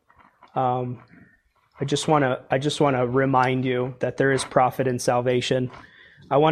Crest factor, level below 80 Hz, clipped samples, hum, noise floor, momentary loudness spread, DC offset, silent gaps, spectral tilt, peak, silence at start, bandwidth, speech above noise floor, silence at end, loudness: 20 dB; -58 dBFS; under 0.1%; none; -61 dBFS; 8 LU; under 0.1%; none; -5.5 dB/octave; -2 dBFS; 0.55 s; 14.5 kHz; 39 dB; 0 s; -23 LUFS